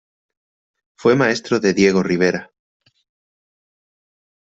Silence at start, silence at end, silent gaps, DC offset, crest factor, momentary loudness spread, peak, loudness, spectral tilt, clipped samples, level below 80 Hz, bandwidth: 1 s; 2.15 s; none; under 0.1%; 18 dB; 5 LU; -2 dBFS; -17 LUFS; -5.5 dB/octave; under 0.1%; -58 dBFS; 8 kHz